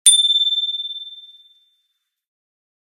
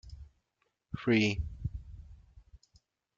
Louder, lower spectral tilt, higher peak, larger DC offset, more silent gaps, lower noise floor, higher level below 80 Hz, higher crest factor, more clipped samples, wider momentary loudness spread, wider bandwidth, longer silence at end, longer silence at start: first, -15 LUFS vs -32 LUFS; second, 8 dB/octave vs -6 dB/octave; first, 0 dBFS vs -14 dBFS; neither; neither; second, -73 dBFS vs -80 dBFS; second, -82 dBFS vs -48 dBFS; about the same, 22 dB vs 22 dB; neither; second, 19 LU vs 25 LU; first, 16.5 kHz vs 7.6 kHz; first, 1.7 s vs 0.6 s; about the same, 0.05 s vs 0.05 s